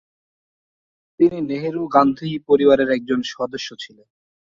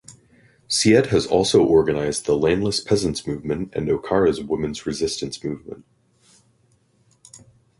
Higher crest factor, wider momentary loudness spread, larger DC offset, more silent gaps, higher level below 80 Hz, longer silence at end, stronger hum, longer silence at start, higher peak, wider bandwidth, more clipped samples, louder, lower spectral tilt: about the same, 20 dB vs 18 dB; about the same, 14 LU vs 12 LU; neither; neither; second, -58 dBFS vs -46 dBFS; first, 0.65 s vs 0.4 s; neither; first, 1.2 s vs 0.1 s; about the same, -2 dBFS vs -4 dBFS; second, 7.4 kHz vs 11.5 kHz; neither; about the same, -19 LUFS vs -20 LUFS; first, -6 dB/octave vs -4.5 dB/octave